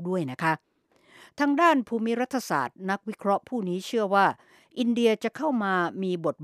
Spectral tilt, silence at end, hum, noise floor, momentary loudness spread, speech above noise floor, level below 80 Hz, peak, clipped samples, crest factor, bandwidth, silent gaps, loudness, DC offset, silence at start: -5.5 dB/octave; 0 s; none; -59 dBFS; 9 LU; 33 dB; -78 dBFS; -8 dBFS; under 0.1%; 18 dB; 15 kHz; none; -26 LUFS; under 0.1%; 0 s